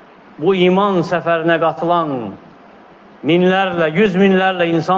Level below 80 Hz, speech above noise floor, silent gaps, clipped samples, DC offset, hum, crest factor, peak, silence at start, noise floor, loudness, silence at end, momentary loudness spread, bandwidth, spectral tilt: -58 dBFS; 28 dB; none; under 0.1%; under 0.1%; none; 14 dB; -2 dBFS; 0.4 s; -42 dBFS; -15 LUFS; 0 s; 8 LU; 7.2 kHz; -7.5 dB/octave